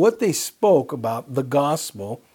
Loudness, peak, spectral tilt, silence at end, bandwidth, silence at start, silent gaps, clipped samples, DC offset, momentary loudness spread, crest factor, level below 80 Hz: -21 LUFS; -6 dBFS; -5 dB/octave; 0.2 s; 18.5 kHz; 0 s; none; under 0.1%; under 0.1%; 9 LU; 16 dB; -70 dBFS